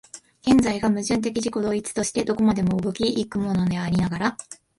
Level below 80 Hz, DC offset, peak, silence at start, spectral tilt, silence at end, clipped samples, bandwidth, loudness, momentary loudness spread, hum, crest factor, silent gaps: -48 dBFS; under 0.1%; -8 dBFS; 0.15 s; -5.5 dB/octave; 0.25 s; under 0.1%; 11.5 kHz; -23 LUFS; 7 LU; none; 16 dB; none